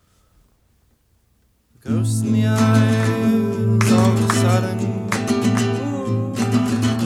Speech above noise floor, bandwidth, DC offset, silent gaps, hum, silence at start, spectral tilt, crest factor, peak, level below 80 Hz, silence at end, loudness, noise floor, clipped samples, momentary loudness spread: 44 dB; 14 kHz; under 0.1%; none; none; 1.85 s; -6.5 dB/octave; 18 dB; -2 dBFS; -52 dBFS; 0 s; -18 LUFS; -61 dBFS; under 0.1%; 7 LU